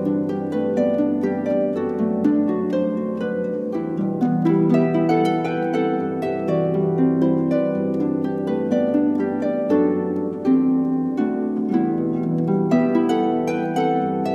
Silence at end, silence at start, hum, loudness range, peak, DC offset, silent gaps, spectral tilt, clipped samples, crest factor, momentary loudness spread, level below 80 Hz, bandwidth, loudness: 0 s; 0 s; none; 1 LU; -6 dBFS; under 0.1%; none; -9 dB/octave; under 0.1%; 14 dB; 5 LU; -58 dBFS; 7.6 kHz; -21 LUFS